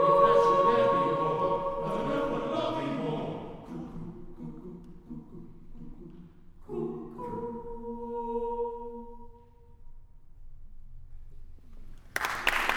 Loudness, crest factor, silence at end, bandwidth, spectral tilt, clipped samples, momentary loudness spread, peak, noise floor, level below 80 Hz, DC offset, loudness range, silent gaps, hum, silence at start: -29 LUFS; 22 dB; 0 s; 18.5 kHz; -5.5 dB/octave; under 0.1%; 25 LU; -8 dBFS; -53 dBFS; -48 dBFS; under 0.1%; 17 LU; none; none; 0 s